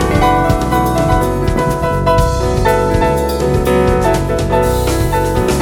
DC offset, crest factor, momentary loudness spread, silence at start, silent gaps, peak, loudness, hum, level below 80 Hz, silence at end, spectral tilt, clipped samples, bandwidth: under 0.1%; 12 dB; 3 LU; 0 s; none; 0 dBFS; -14 LUFS; none; -20 dBFS; 0 s; -6 dB/octave; under 0.1%; 18 kHz